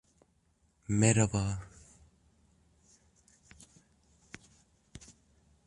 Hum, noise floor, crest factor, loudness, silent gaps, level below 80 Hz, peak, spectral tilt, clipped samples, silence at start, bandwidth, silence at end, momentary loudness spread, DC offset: none; -72 dBFS; 26 dB; -30 LUFS; none; -56 dBFS; -12 dBFS; -5 dB/octave; under 0.1%; 0.9 s; 11 kHz; 0.7 s; 27 LU; under 0.1%